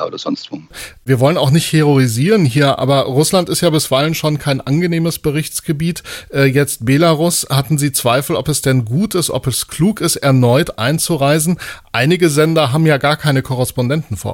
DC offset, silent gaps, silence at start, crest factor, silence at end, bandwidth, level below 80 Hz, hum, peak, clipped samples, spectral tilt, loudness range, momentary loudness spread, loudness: under 0.1%; none; 0 s; 14 dB; 0 s; 17 kHz; -44 dBFS; none; 0 dBFS; under 0.1%; -5 dB/octave; 2 LU; 8 LU; -14 LUFS